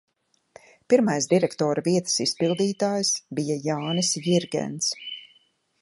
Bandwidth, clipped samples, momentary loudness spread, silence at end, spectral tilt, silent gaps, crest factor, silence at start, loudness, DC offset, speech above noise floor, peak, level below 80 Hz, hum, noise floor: 11.5 kHz; under 0.1%; 6 LU; 0.55 s; -4 dB/octave; none; 18 dB; 0.9 s; -24 LUFS; under 0.1%; 40 dB; -6 dBFS; -70 dBFS; none; -63 dBFS